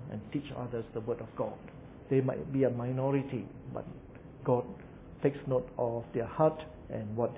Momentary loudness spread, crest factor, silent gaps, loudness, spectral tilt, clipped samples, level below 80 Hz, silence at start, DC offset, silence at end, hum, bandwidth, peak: 17 LU; 20 dB; none; -34 LUFS; -8.5 dB/octave; under 0.1%; -58 dBFS; 0 s; under 0.1%; 0 s; none; 3.9 kHz; -14 dBFS